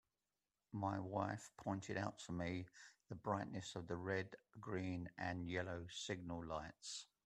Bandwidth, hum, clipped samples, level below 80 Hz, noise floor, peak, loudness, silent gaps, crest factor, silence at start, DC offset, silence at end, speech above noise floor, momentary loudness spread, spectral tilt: 11 kHz; none; under 0.1%; -72 dBFS; under -90 dBFS; -26 dBFS; -47 LUFS; none; 20 dB; 0.7 s; under 0.1%; 0.2 s; over 44 dB; 7 LU; -5 dB/octave